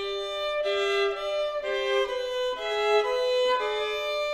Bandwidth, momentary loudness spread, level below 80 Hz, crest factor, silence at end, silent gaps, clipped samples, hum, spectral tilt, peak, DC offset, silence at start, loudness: 14.5 kHz; 5 LU; -58 dBFS; 16 dB; 0 s; none; under 0.1%; none; -1.5 dB/octave; -12 dBFS; under 0.1%; 0 s; -27 LUFS